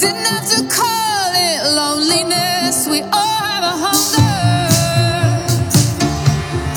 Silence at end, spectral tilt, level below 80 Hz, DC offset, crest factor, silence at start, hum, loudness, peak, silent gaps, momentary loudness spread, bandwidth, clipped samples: 0 s; -3.5 dB/octave; -38 dBFS; under 0.1%; 14 dB; 0 s; none; -14 LUFS; 0 dBFS; none; 3 LU; over 20 kHz; under 0.1%